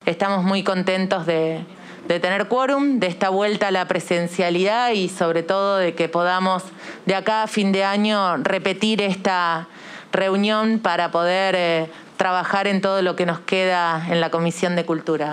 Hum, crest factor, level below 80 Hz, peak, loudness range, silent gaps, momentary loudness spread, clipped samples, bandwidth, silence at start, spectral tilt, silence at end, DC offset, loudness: none; 16 dB; -72 dBFS; -4 dBFS; 1 LU; none; 5 LU; under 0.1%; 12 kHz; 0.05 s; -5 dB/octave; 0 s; under 0.1%; -20 LUFS